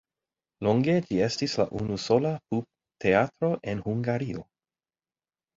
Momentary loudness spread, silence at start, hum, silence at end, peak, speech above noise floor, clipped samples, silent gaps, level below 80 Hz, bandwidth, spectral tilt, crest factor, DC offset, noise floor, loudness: 8 LU; 0.6 s; none; 1.15 s; -8 dBFS; over 64 dB; under 0.1%; none; -58 dBFS; 7.8 kHz; -6.5 dB/octave; 20 dB; under 0.1%; under -90 dBFS; -27 LUFS